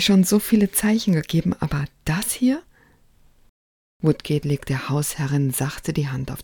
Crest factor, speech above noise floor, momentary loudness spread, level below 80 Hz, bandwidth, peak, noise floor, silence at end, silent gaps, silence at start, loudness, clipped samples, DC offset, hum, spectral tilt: 18 dB; 34 dB; 8 LU; -46 dBFS; 18 kHz; -4 dBFS; -55 dBFS; 0 s; 3.49-4.00 s; 0 s; -22 LUFS; under 0.1%; under 0.1%; none; -5 dB/octave